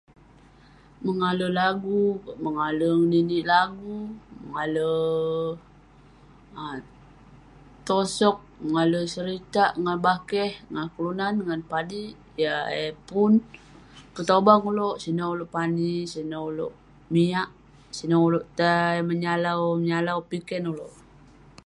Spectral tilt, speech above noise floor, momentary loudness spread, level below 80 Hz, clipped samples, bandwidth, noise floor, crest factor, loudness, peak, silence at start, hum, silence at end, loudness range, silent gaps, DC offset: -6 dB/octave; 29 dB; 14 LU; -58 dBFS; under 0.1%; 11.5 kHz; -53 dBFS; 24 dB; -25 LUFS; -2 dBFS; 1 s; none; 0.75 s; 6 LU; none; under 0.1%